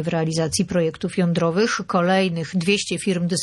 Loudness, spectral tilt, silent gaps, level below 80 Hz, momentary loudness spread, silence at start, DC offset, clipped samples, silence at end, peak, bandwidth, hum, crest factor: -21 LUFS; -5 dB/octave; none; -54 dBFS; 4 LU; 0 s; under 0.1%; under 0.1%; 0 s; -6 dBFS; 12.5 kHz; none; 14 dB